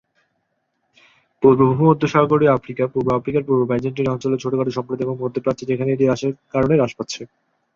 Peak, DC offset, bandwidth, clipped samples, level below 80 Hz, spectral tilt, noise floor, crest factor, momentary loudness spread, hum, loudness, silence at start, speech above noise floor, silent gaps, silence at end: -2 dBFS; under 0.1%; 7.6 kHz; under 0.1%; -52 dBFS; -7.5 dB/octave; -71 dBFS; 18 dB; 9 LU; none; -19 LUFS; 1.4 s; 53 dB; none; 0.5 s